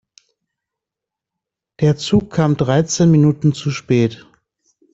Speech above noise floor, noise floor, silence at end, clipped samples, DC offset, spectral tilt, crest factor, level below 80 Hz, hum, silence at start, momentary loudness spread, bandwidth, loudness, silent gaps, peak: 70 dB; -85 dBFS; 0.8 s; under 0.1%; under 0.1%; -6.5 dB/octave; 16 dB; -48 dBFS; none; 1.8 s; 6 LU; 8 kHz; -16 LUFS; none; -2 dBFS